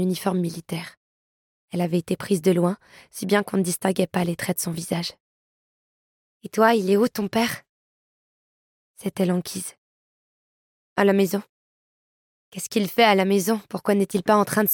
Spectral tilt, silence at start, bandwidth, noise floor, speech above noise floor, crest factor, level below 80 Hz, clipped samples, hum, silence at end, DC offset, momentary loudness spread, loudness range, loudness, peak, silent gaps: -5 dB/octave; 0 s; 17.5 kHz; under -90 dBFS; over 68 dB; 20 dB; -66 dBFS; under 0.1%; none; 0 s; under 0.1%; 14 LU; 5 LU; -23 LUFS; -4 dBFS; 0.97-1.68 s, 5.20-6.40 s, 7.69-8.94 s, 9.78-10.96 s, 11.49-12.52 s